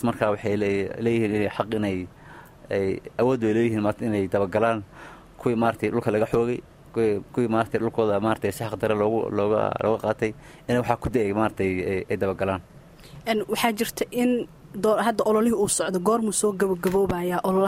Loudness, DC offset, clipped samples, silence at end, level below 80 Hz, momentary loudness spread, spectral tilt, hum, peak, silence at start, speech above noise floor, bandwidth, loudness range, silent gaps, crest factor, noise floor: -24 LUFS; under 0.1%; under 0.1%; 0 s; -52 dBFS; 6 LU; -5.5 dB/octave; none; -4 dBFS; 0 s; 22 dB; 16 kHz; 3 LU; none; 20 dB; -46 dBFS